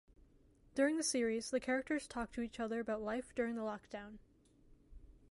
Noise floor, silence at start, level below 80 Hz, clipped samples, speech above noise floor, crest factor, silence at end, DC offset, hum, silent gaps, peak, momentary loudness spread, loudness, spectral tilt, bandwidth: -67 dBFS; 0.75 s; -64 dBFS; under 0.1%; 29 dB; 18 dB; 0.2 s; under 0.1%; none; none; -22 dBFS; 11 LU; -39 LUFS; -3 dB/octave; 11.5 kHz